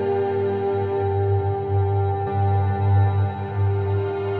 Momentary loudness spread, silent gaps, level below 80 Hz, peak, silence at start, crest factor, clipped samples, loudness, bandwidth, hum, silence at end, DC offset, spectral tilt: 4 LU; none; -56 dBFS; -10 dBFS; 0 s; 10 dB; under 0.1%; -22 LUFS; 4.1 kHz; none; 0 s; under 0.1%; -11.5 dB/octave